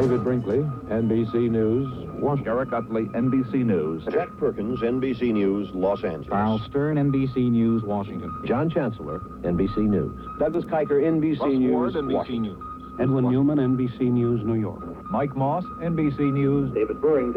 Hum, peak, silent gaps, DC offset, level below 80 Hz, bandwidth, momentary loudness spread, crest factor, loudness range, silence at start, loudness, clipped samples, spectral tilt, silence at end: none; -10 dBFS; none; under 0.1%; -48 dBFS; 5.8 kHz; 7 LU; 14 dB; 2 LU; 0 s; -24 LUFS; under 0.1%; -10 dB/octave; 0 s